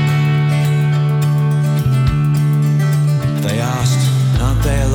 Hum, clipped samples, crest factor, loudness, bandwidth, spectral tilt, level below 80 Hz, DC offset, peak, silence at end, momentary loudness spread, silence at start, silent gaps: none; under 0.1%; 10 dB; -15 LUFS; 17 kHz; -6.5 dB/octave; -26 dBFS; under 0.1%; -2 dBFS; 0 s; 2 LU; 0 s; none